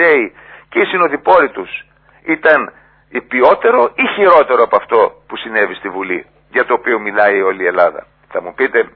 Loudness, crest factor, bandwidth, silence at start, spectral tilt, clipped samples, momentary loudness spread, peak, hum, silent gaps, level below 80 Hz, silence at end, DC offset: -13 LUFS; 14 dB; 5.4 kHz; 0 s; -7.5 dB/octave; 0.1%; 15 LU; 0 dBFS; none; none; -54 dBFS; 0.1 s; under 0.1%